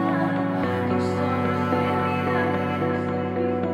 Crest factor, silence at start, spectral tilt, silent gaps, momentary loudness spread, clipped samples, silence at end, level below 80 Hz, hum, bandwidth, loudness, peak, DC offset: 14 dB; 0 s; -8 dB/octave; none; 2 LU; under 0.1%; 0 s; -60 dBFS; none; 13.5 kHz; -24 LUFS; -10 dBFS; under 0.1%